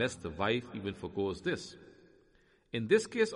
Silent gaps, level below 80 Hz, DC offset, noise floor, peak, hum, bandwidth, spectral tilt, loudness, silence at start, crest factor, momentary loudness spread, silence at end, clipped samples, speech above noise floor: none; -62 dBFS; under 0.1%; -67 dBFS; -14 dBFS; none; 11.5 kHz; -5 dB/octave; -34 LUFS; 0 s; 20 dB; 11 LU; 0 s; under 0.1%; 34 dB